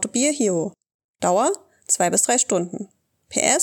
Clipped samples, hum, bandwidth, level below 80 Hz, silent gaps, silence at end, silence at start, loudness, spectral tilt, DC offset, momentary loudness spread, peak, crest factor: under 0.1%; none; 19 kHz; -70 dBFS; 0.94-1.14 s; 0 s; 0 s; -20 LUFS; -2.5 dB/octave; under 0.1%; 14 LU; -2 dBFS; 20 dB